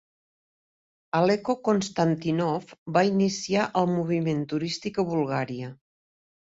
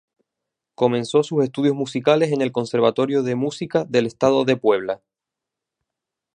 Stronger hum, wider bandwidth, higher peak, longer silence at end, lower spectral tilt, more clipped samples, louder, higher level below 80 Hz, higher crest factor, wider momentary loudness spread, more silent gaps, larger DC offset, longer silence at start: neither; second, 8 kHz vs 10 kHz; second, -8 dBFS vs -2 dBFS; second, 0.85 s vs 1.4 s; about the same, -6 dB/octave vs -6 dB/octave; neither; second, -26 LUFS vs -20 LUFS; about the same, -64 dBFS vs -64 dBFS; about the same, 18 dB vs 18 dB; about the same, 6 LU vs 5 LU; first, 2.78-2.86 s vs none; neither; first, 1.15 s vs 0.8 s